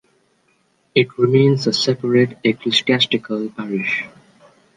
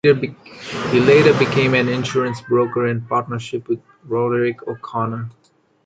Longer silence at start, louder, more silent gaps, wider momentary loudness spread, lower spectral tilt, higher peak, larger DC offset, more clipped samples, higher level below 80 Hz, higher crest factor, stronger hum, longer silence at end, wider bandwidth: first, 0.95 s vs 0.05 s; about the same, -17 LUFS vs -18 LUFS; neither; second, 10 LU vs 16 LU; about the same, -5.5 dB/octave vs -6.5 dB/octave; about the same, -2 dBFS vs 0 dBFS; neither; neither; second, -64 dBFS vs -54 dBFS; about the same, 16 dB vs 18 dB; neither; first, 0.7 s vs 0.55 s; about the same, 9.6 kHz vs 9 kHz